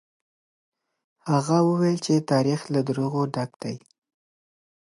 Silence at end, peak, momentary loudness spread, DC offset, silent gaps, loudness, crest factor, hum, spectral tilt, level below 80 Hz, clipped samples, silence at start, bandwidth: 1.1 s; -8 dBFS; 14 LU; under 0.1%; 3.56-3.60 s; -24 LUFS; 18 dB; none; -6.5 dB/octave; -72 dBFS; under 0.1%; 1.25 s; 11.5 kHz